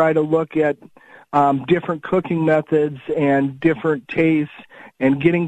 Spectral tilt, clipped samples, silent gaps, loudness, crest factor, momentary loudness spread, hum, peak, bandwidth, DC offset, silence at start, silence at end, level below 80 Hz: -8.5 dB/octave; under 0.1%; none; -19 LUFS; 16 dB; 5 LU; none; -2 dBFS; 8.8 kHz; under 0.1%; 0 s; 0 s; -56 dBFS